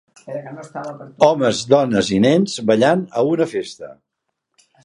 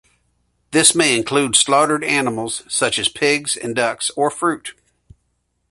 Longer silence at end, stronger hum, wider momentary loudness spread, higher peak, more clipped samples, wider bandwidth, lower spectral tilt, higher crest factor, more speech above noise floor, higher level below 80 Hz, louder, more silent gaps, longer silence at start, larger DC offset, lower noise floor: about the same, 0.95 s vs 1 s; neither; first, 17 LU vs 9 LU; about the same, 0 dBFS vs 0 dBFS; neither; about the same, 11.5 kHz vs 12 kHz; first, -5.5 dB/octave vs -2 dB/octave; about the same, 18 dB vs 20 dB; first, 58 dB vs 51 dB; about the same, -56 dBFS vs -56 dBFS; about the same, -16 LUFS vs -16 LUFS; neither; second, 0.25 s vs 0.7 s; neither; first, -75 dBFS vs -69 dBFS